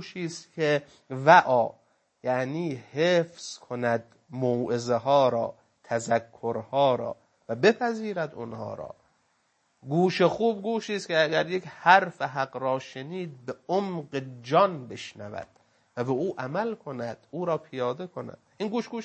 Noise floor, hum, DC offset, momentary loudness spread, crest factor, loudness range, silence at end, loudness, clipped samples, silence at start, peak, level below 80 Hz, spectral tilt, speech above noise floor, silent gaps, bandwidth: -71 dBFS; none; under 0.1%; 15 LU; 24 dB; 6 LU; 0 s; -27 LUFS; under 0.1%; 0 s; -2 dBFS; -72 dBFS; -5.5 dB/octave; 44 dB; none; 8.8 kHz